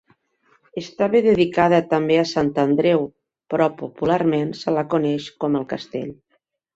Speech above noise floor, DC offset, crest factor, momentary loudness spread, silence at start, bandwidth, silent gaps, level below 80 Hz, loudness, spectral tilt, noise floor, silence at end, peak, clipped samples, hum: 50 dB; under 0.1%; 18 dB; 14 LU; 0.75 s; 8 kHz; none; -56 dBFS; -20 LUFS; -7 dB/octave; -69 dBFS; 0.6 s; -2 dBFS; under 0.1%; none